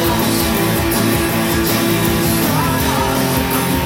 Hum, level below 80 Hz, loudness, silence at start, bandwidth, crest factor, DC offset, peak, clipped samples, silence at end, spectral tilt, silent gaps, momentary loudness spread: none; -32 dBFS; -15 LUFS; 0 s; 17 kHz; 12 dB; under 0.1%; -2 dBFS; under 0.1%; 0 s; -4.5 dB/octave; none; 1 LU